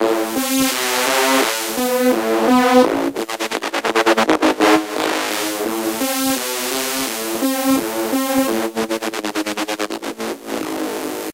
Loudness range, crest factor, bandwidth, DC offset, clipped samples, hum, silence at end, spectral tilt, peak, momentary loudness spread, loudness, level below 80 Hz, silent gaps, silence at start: 5 LU; 18 dB; 16.5 kHz; under 0.1%; under 0.1%; none; 0 s; -2 dB/octave; 0 dBFS; 9 LU; -18 LUFS; -56 dBFS; none; 0 s